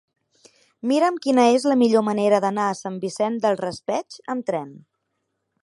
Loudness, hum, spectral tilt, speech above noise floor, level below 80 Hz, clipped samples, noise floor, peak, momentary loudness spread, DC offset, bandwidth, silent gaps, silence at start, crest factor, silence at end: -21 LUFS; none; -5 dB/octave; 55 dB; -72 dBFS; under 0.1%; -76 dBFS; -6 dBFS; 12 LU; under 0.1%; 11.5 kHz; none; 0.85 s; 18 dB; 0.85 s